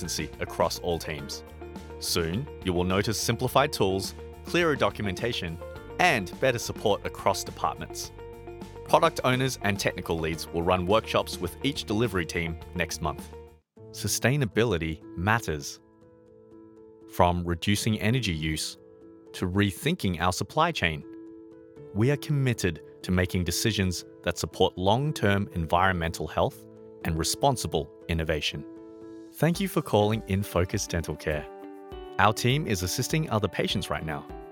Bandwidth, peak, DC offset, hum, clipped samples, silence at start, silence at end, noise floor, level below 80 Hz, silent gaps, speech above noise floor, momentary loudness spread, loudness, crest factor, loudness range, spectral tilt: 19 kHz; -4 dBFS; under 0.1%; none; under 0.1%; 0 s; 0 s; -55 dBFS; -46 dBFS; none; 28 dB; 16 LU; -27 LUFS; 24 dB; 3 LU; -4.5 dB/octave